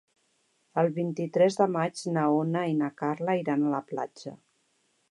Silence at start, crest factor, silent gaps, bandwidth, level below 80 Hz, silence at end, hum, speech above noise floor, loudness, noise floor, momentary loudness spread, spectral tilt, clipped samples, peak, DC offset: 0.75 s; 18 dB; none; 11.5 kHz; -82 dBFS; 0.75 s; none; 44 dB; -28 LUFS; -71 dBFS; 11 LU; -7 dB/octave; under 0.1%; -10 dBFS; under 0.1%